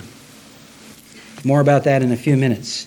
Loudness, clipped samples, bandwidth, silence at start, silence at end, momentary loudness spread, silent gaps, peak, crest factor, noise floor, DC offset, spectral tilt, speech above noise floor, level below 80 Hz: -17 LUFS; under 0.1%; 17.5 kHz; 0 s; 0 s; 5 LU; none; -2 dBFS; 16 dB; -43 dBFS; under 0.1%; -6.5 dB/octave; 27 dB; -60 dBFS